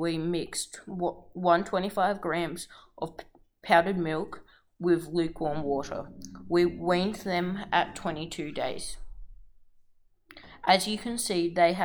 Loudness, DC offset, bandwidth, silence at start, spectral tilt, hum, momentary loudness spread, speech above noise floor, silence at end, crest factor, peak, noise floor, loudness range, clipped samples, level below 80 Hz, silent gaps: -29 LUFS; under 0.1%; over 20 kHz; 0 s; -4.5 dB/octave; none; 15 LU; 32 dB; 0 s; 22 dB; -6 dBFS; -61 dBFS; 4 LU; under 0.1%; -52 dBFS; none